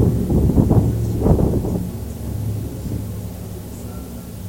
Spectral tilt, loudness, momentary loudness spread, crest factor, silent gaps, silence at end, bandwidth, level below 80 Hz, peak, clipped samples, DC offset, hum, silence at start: -8.5 dB/octave; -20 LUFS; 15 LU; 18 dB; none; 0 s; 17 kHz; -28 dBFS; -2 dBFS; under 0.1%; under 0.1%; none; 0 s